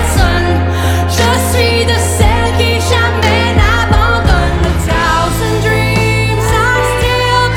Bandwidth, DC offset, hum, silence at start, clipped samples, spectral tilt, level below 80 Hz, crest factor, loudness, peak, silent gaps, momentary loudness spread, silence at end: 17 kHz; under 0.1%; none; 0 s; under 0.1%; -4.5 dB/octave; -18 dBFS; 10 dB; -11 LUFS; 0 dBFS; none; 3 LU; 0 s